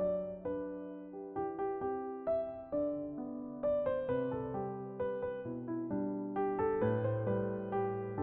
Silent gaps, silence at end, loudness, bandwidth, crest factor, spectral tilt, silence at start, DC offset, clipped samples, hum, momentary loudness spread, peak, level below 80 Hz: none; 0 s; -37 LUFS; 4 kHz; 14 dB; -8.5 dB/octave; 0 s; under 0.1%; under 0.1%; none; 8 LU; -22 dBFS; -64 dBFS